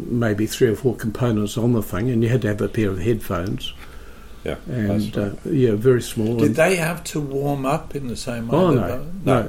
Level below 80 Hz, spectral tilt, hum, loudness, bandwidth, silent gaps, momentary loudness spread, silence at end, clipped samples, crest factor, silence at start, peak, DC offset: -40 dBFS; -6.5 dB/octave; none; -21 LUFS; 17 kHz; none; 10 LU; 0 s; under 0.1%; 16 dB; 0 s; -4 dBFS; under 0.1%